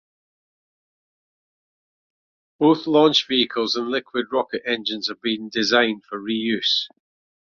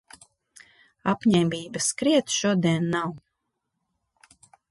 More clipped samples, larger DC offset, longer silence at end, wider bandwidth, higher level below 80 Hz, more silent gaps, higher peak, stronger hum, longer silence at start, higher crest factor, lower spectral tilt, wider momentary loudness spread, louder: neither; neither; second, 0.7 s vs 1.55 s; second, 7.2 kHz vs 11.5 kHz; about the same, -66 dBFS vs -64 dBFS; neither; first, -2 dBFS vs -10 dBFS; neither; first, 2.6 s vs 1.05 s; about the same, 20 dB vs 18 dB; about the same, -4 dB/octave vs -4.5 dB/octave; about the same, 9 LU vs 7 LU; first, -21 LUFS vs -24 LUFS